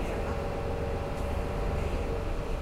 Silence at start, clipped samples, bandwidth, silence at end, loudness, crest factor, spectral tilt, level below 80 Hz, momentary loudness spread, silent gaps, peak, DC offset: 0 s; under 0.1%; 16 kHz; 0 s; -33 LUFS; 12 dB; -7 dB/octave; -34 dBFS; 2 LU; none; -18 dBFS; under 0.1%